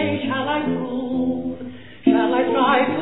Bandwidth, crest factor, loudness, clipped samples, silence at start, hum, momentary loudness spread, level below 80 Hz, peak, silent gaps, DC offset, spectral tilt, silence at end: 4.1 kHz; 16 dB; -21 LUFS; under 0.1%; 0 s; none; 11 LU; -58 dBFS; -4 dBFS; none; 0.6%; -9.5 dB/octave; 0 s